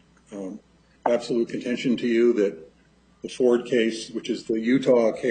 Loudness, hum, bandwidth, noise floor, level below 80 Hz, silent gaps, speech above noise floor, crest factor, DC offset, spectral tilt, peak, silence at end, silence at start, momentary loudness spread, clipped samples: -23 LUFS; none; 9.4 kHz; -59 dBFS; -64 dBFS; none; 36 dB; 18 dB; under 0.1%; -5.5 dB/octave; -6 dBFS; 0 s; 0.3 s; 18 LU; under 0.1%